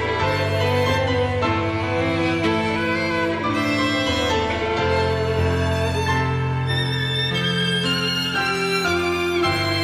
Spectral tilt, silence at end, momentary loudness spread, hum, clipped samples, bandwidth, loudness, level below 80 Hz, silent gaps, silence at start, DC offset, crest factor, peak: -5 dB/octave; 0 s; 2 LU; none; under 0.1%; 15.5 kHz; -21 LUFS; -40 dBFS; none; 0 s; under 0.1%; 12 dB; -8 dBFS